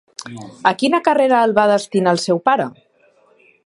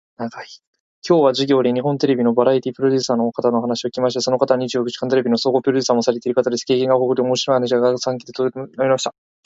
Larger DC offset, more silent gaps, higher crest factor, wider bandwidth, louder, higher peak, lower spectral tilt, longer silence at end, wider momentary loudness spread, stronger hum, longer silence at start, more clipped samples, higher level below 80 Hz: neither; second, none vs 0.67-0.73 s, 0.80-1.02 s; about the same, 18 dB vs 18 dB; first, 11.5 kHz vs 7.8 kHz; about the same, -16 LUFS vs -18 LUFS; about the same, 0 dBFS vs 0 dBFS; about the same, -5 dB/octave vs -5 dB/octave; first, 0.95 s vs 0.35 s; first, 16 LU vs 8 LU; neither; about the same, 0.2 s vs 0.2 s; neither; about the same, -66 dBFS vs -64 dBFS